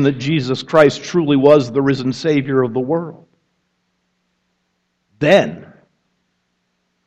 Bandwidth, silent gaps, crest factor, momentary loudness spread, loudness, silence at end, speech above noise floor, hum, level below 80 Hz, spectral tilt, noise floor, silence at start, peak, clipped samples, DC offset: 8.4 kHz; none; 18 dB; 10 LU; -15 LUFS; 1.4 s; 54 dB; none; -56 dBFS; -6.5 dB/octave; -69 dBFS; 0 s; 0 dBFS; under 0.1%; under 0.1%